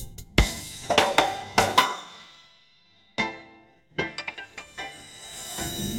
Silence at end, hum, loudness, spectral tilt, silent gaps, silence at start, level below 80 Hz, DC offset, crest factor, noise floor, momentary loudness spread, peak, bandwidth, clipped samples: 0 s; none; -26 LUFS; -3 dB/octave; none; 0 s; -40 dBFS; under 0.1%; 26 dB; -61 dBFS; 19 LU; -2 dBFS; 17 kHz; under 0.1%